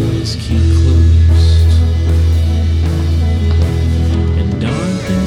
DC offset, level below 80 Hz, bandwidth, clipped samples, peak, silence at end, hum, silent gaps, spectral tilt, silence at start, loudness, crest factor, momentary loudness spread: under 0.1%; -16 dBFS; 10 kHz; under 0.1%; -2 dBFS; 0 s; none; none; -7 dB/octave; 0 s; -13 LUFS; 10 dB; 7 LU